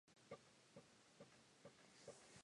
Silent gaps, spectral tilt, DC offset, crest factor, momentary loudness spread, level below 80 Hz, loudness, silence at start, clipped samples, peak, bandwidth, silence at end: none; -3.5 dB/octave; under 0.1%; 22 dB; 5 LU; under -90 dBFS; -65 LUFS; 0.05 s; under 0.1%; -44 dBFS; 11 kHz; 0 s